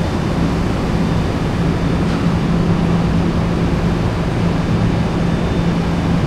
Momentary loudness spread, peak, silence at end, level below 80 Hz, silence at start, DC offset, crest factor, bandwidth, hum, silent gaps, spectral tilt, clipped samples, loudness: 2 LU; -4 dBFS; 0 s; -26 dBFS; 0 s; under 0.1%; 12 dB; 11 kHz; none; none; -7.5 dB/octave; under 0.1%; -17 LUFS